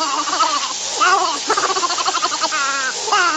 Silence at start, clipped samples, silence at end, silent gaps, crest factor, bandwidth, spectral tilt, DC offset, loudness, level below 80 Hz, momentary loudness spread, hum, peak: 0 s; under 0.1%; 0 s; none; 14 dB; 19 kHz; 1 dB/octave; under 0.1%; -17 LUFS; -62 dBFS; 4 LU; none; -4 dBFS